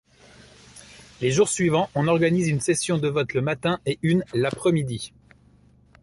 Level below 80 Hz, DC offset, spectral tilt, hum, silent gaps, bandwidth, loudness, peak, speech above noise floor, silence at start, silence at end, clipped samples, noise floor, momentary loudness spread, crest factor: -56 dBFS; under 0.1%; -5.5 dB/octave; none; none; 11.5 kHz; -23 LUFS; -8 dBFS; 33 dB; 0.75 s; 0.95 s; under 0.1%; -56 dBFS; 7 LU; 16 dB